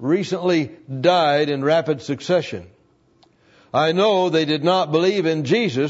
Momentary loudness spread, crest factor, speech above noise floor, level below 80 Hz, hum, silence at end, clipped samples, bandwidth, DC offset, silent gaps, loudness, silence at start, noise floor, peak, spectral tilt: 8 LU; 16 dB; 39 dB; -66 dBFS; none; 0 s; under 0.1%; 8 kHz; under 0.1%; none; -19 LUFS; 0 s; -58 dBFS; -4 dBFS; -6 dB/octave